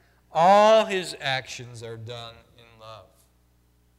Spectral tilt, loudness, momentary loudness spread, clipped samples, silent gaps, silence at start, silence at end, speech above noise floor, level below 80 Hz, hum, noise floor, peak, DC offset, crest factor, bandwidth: -4 dB/octave; -20 LUFS; 22 LU; under 0.1%; none; 0.35 s; 1 s; 40 dB; -64 dBFS; 60 Hz at -60 dBFS; -63 dBFS; -6 dBFS; under 0.1%; 18 dB; 13.5 kHz